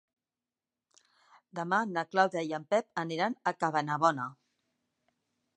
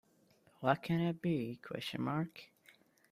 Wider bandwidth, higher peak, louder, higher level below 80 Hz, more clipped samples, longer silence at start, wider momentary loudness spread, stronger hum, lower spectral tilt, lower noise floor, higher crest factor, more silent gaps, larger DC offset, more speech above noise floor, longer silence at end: second, 10.5 kHz vs 15 kHz; first, -10 dBFS vs -18 dBFS; first, -31 LUFS vs -37 LUFS; second, -86 dBFS vs -74 dBFS; neither; first, 1.55 s vs 0.6 s; about the same, 10 LU vs 9 LU; neither; second, -5 dB/octave vs -7.5 dB/octave; first, under -90 dBFS vs -70 dBFS; about the same, 22 dB vs 22 dB; neither; neither; first, over 59 dB vs 33 dB; first, 1.25 s vs 0.65 s